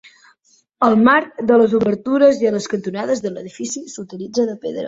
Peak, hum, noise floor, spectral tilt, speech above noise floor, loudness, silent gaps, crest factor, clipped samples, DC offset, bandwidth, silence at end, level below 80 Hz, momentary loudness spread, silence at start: 0 dBFS; none; -58 dBFS; -5 dB/octave; 41 dB; -17 LUFS; none; 16 dB; under 0.1%; under 0.1%; 7.8 kHz; 0 s; -58 dBFS; 14 LU; 0.8 s